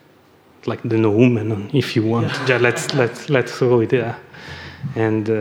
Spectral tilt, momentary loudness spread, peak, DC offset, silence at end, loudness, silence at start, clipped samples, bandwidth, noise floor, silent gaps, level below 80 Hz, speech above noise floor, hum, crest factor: -6.5 dB/octave; 15 LU; 0 dBFS; under 0.1%; 0 s; -18 LUFS; 0.65 s; under 0.1%; 16.5 kHz; -51 dBFS; none; -58 dBFS; 33 dB; none; 18 dB